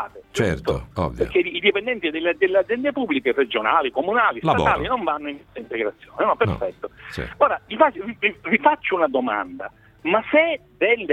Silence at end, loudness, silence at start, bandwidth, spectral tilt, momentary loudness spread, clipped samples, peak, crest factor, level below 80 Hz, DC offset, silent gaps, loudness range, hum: 0 s; -21 LUFS; 0 s; 12.5 kHz; -6 dB/octave; 11 LU; under 0.1%; -2 dBFS; 20 dB; -44 dBFS; under 0.1%; none; 3 LU; none